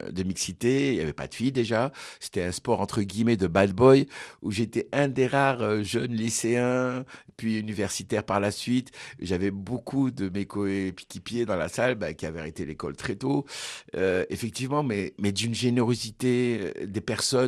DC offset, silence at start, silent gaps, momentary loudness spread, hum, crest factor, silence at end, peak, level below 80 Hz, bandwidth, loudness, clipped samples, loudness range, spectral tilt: under 0.1%; 0 s; none; 11 LU; none; 22 dB; 0 s; -6 dBFS; -56 dBFS; 13.5 kHz; -27 LUFS; under 0.1%; 6 LU; -5 dB/octave